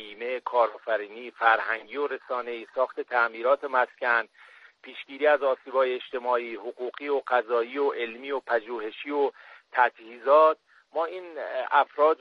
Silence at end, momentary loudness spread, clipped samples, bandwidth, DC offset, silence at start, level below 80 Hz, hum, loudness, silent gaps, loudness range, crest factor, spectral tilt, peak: 0.05 s; 12 LU; under 0.1%; 5.8 kHz; under 0.1%; 0 s; -82 dBFS; none; -27 LUFS; none; 3 LU; 20 dB; -4 dB/octave; -6 dBFS